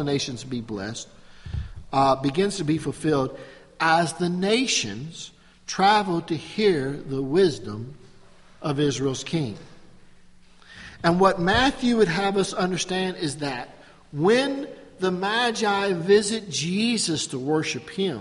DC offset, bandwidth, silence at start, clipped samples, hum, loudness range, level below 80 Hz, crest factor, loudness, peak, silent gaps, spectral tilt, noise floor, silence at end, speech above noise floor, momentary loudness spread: under 0.1%; 11.5 kHz; 0 s; under 0.1%; none; 4 LU; -48 dBFS; 20 dB; -23 LUFS; -4 dBFS; none; -4.5 dB/octave; -50 dBFS; 0 s; 26 dB; 16 LU